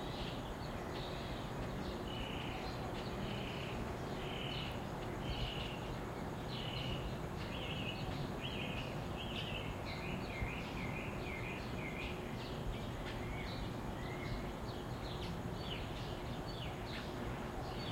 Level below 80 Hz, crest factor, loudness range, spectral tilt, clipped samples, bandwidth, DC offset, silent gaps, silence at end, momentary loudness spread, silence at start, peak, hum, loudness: -50 dBFS; 14 dB; 2 LU; -5.5 dB/octave; under 0.1%; 16 kHz; under 0.1%; none; 0 s; 3 LU; 0 s; -28 dBFS; none; -43 LUFS